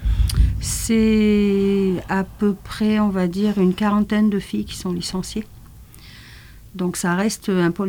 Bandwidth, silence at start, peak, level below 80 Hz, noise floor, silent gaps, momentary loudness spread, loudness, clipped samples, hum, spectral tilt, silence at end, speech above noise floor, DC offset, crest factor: 19.5 kHz; 0 s; -4 dBFS; -30 dBFS; -42 dBFS; none; 10 LU; -20 LUFS; under 0.1%; none; -6 dB/octave; 0 s; 23 dB; under 0.1%; 16 dB